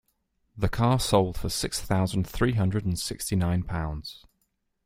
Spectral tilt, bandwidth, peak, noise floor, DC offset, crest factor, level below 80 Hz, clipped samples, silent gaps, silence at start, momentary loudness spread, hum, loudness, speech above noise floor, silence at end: -5.5 dB/octave; 16 kHz; -6 dBFS; -75 dBFS; under 0.1%; 22 dB; -42 dBFS; under 0.1%; none; 0.55 s; 8 LU; none; -27 LUFS; 49 dB; 0.7 s